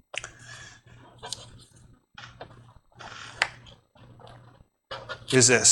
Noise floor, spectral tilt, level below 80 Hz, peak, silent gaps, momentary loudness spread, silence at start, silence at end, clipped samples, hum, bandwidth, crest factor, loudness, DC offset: -56 dBFS; -2 dB/octave; -60 dBFS; -4 dBFS; none; 28 LU; 0.15 s; 0 s; under 0.1%; none; 16.5 kHz; 26 dB; -25 LUFS; under 0.1%